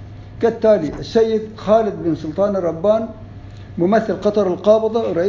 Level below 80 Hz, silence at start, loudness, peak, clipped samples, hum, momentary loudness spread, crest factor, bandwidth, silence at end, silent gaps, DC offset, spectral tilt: -44 dBFS; 0 s; -17 LUFS; -2 dBFS; under 0.1%; none; 16 LU; 16 dB; 7.4 kHz; 0 s; none; under 0.1%; -7.5 dB/octave